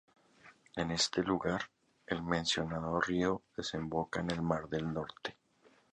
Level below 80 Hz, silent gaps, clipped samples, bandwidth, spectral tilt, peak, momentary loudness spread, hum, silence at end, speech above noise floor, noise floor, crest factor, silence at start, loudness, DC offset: -58 dBFS; none; under 0.1%; 10.5 kHz; -4.5 dB/octave; -16 dBFS; 9 LU; none; 0.6 s; 32 dB; -68 dBFS; 20 dB; 0.45 s; -35 LUFS; under 0.1%